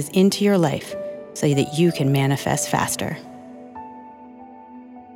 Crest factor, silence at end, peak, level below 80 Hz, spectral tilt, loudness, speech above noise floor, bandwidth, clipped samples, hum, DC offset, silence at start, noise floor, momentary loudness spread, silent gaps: 16 dB; 0 s; -6 dBFS; -58 dBFS; -5.5 dB/octave; -21 LUFS; 22 dB; 17 kHz; under 0.1%; none; under 0.1%; 0 s; -42 dBFS; 23 LU; none